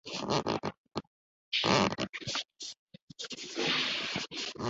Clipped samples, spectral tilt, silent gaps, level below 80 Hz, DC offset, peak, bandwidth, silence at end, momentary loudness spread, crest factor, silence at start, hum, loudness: under 0.1%; -2 dB/octave; 0.77-0.84 s, 1.07-1.52 s, 2.79-2.87 s, 3.02-3.08 s; -62 dBFS; under 0.1%; -10 dBFS; 8 kHz; 0 s; 16 LU; 24 dB; 0.05 s; none; -32 LUFS